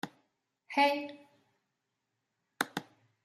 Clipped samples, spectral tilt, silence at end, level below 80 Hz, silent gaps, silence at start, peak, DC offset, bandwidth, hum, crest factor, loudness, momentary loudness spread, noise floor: under 0.1%; -3 dB/octave; 0.45 s; -86 dBFS; none; 0.05 s; -14 dBFS; under 0.1%; 14.5 kHz; none; 24 dB; -33 LUFS; 17 LU; -84 dBFS